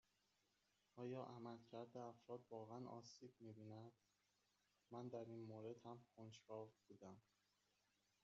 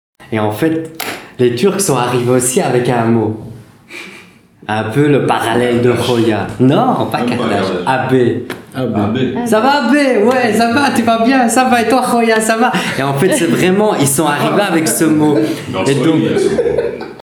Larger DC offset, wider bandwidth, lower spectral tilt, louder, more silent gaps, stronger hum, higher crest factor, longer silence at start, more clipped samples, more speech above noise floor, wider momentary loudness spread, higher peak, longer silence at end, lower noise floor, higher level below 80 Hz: neither; second, 7.4 kHz vs over 20 kHz; first, -6.5 dB/octave vs -5 dB/octave; second, -58 LUFS vs -13 LUFS; neither; neither; first, 18 dB vs 12 dB; first, 0.95 s vs 0.2 s; neither; about the same, 29 dB vs 28 dB; about the same, 9 LU vs 9 LU; second, -40 dBFS vs 0 dBFS; first, 1.05 s vs 0 s; first, -87 dBFS vs -40 dBFS; second, under -90 dBFS vs -50 dBFS